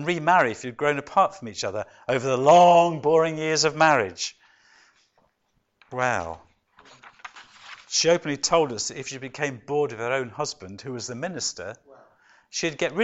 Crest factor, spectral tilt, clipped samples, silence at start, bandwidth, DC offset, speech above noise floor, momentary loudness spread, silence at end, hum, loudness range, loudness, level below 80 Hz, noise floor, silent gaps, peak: 18 dB; -3.5 dB/octave; under 0.1%; 0 s; 8.2 kHz; under 0.1%; 49 dB; 18 LU; 0 s; none; 11 LU; -23 LUFS; -62 dBFS; -72 dBFS; none; -6 dBFS